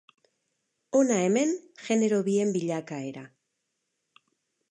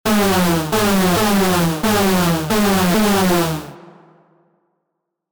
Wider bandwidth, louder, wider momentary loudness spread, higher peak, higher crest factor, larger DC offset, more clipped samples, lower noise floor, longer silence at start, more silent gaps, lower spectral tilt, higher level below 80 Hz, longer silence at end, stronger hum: second, 10 kHz vs over 20 kHz; second, -27 LUFS vs -16 LUFS; first, 13 LU vs 3 LU; second, -12 dBFS vs -8 dBFS; first, 16 dB vs 10 dB; neither; neither; first, -80 dBFS vs -76 dBFS; first, 0.95 s vs 0.05 s; neither; about the same, -5.5 dB/octave vs -4.5 dB/octave; second, -80 dBFS vs -40 dBFS; first, 1.45 s vs 0 s; neither